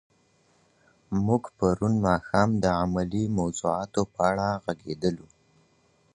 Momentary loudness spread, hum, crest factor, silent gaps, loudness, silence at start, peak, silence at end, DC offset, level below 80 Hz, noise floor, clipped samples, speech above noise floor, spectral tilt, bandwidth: 6 LU; none; 22 dB; none; -26 LUFS; 1.1 s; -6 dBFS; 0.9 s; under 0.1%; -48 dBFS; -65 dBFS; under 0.1%; 39 dB; -6.5 dB/octave; 10.5 kHz